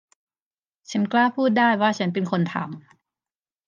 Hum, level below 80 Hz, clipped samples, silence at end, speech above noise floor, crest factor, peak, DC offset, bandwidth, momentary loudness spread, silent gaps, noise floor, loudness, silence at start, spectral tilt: none; -76 dBFS; under 0.1%; 0.85 s; over 68 dB; 18 dB; -6 dBFS; under 0.1%; 7.6 kHz; 12 LU; none; under -90 dBFS; -22 LUFS; 0.9 s; -6 dB/octave